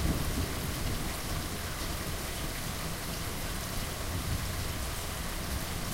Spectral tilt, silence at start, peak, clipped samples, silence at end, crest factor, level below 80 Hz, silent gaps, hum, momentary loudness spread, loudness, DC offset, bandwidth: -4 dB/octave; 0 s; -18 dBFS; under 0.1%; 0 s; 16 dB; -38 dBFS; none; none; 2 LU; -35 LUFS; under 0.1%; 16 kHz